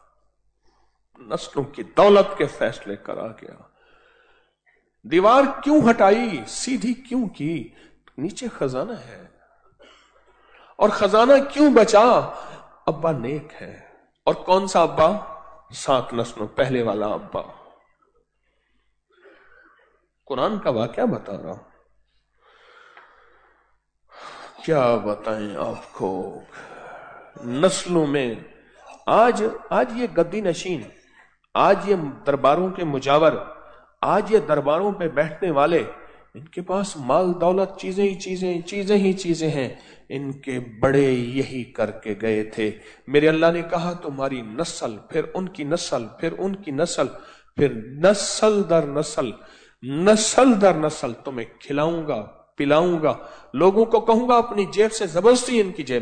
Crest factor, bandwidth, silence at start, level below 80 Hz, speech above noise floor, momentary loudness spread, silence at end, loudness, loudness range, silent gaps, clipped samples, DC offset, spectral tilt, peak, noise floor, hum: 18 dB; 9.4 kHz; 1.25 s; -54 dBFS; 48 dB; 16 LU; 0 s; -21 LUFS; 9 LU; none; under 0.1%; under 0.1%; -5 dB/octave; -4 dBFS; -69 dBFS; none